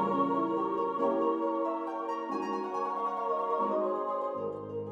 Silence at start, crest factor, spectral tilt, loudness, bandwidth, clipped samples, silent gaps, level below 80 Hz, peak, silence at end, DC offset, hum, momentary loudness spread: 0 s; 14 dB; -7.5 dB/octave; -32 LUFS; 8 kHz; under 0.1%; none; -78 dBFS; -16 dBFS; 0 s; under 0.1%; none; 6 LU